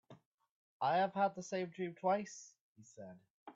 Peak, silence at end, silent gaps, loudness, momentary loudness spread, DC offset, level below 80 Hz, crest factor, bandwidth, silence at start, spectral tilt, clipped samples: -22 dBFS; 0.05 s; 0.25-0.38 s, 0.51-0.80 s, 2.60-2.75 s, 3.30-3.46 s; -37 LUFS; 21 LU; under 0.1%; -86 dBFS; 18 dB; 7.8 kHz; 0.1 s; -5 dB/octave; under 0.1%